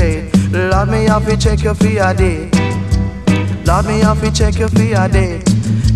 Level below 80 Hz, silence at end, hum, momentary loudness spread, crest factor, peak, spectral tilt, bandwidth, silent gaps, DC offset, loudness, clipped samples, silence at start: -20 dBFS; 0 s; none; 3 LU; 12 dB; 0 dBFS; -6.5 dB/octave; 13 kHz; none; under 0.1%; -14 LUFS; under 0.1%; 0 s